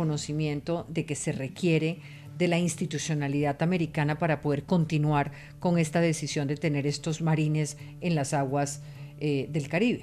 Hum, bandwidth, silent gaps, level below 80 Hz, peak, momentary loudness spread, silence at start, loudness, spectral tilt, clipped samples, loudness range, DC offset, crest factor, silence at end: none; 13 kHz; none; -56 dBFS; -14 dBFS; 7 LU; 0 s; -28 LUFS; -6 dB/octave; under 0.1%; 2 LU; under 0.1%; 14 dB; 0 s